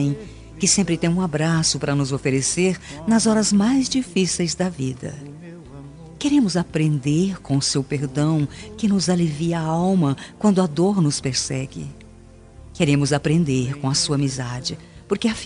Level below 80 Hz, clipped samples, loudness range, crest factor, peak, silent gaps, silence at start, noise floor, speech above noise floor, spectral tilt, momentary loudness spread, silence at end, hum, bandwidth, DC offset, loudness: -48 dBFS; under 0.1%; 3 LU; 16 dB; -4 dBFS; none; 0 s; -45 dBFS; 24 dB; -5 dB/octave; 14 LU; 0 s; none; 11 kHz; under 0.1%; -21 LUFS